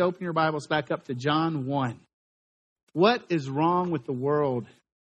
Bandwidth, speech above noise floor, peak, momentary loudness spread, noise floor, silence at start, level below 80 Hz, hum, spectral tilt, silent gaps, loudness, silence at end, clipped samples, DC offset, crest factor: 9.2 kHz; over 64 dB; -6 dBFS; 9 LU; under -90 dBFS; 0 s; -68 dBFS; none; -7 dB/octave; 2.13-2.76 s, 2.83-2.87 s; -27 LUFS; 0.45 s; under 0.1%; under 0.1%; 20 dB